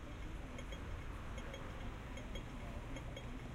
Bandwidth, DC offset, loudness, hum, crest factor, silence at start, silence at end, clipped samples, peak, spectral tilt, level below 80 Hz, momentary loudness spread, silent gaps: 16 kHz; under 0.1%; -49 LUFS; none; 14 dB; 0 s; 0 s; under 0.1%; -32 dBFS; -5.5 dB/octave; -50 dBFS; 1 LU; none